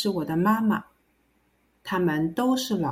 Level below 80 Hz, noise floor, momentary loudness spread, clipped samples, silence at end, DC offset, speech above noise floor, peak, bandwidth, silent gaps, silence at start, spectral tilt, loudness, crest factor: -62 dBFS; -67 dBFS; 8 LU; under 0.1%; 0 s; under 0.1%; 43 dB; -10 dBFS; 16.5 kHz; none; 0 s; -6 dB/octave; -25 LUFS; 16 dB